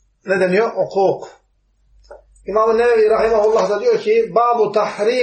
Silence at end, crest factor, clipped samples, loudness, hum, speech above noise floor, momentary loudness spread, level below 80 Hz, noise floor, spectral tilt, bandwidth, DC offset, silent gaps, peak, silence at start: 0 s; 14 dB; under 0.1%; -16 LUFS; none; 44 dB; 5 LU; -50 dBFS; -60 dBFS; -5.5 dB/octave; 8.8 kHz; under 0.1%; none; -2 dBFS; 0.25 s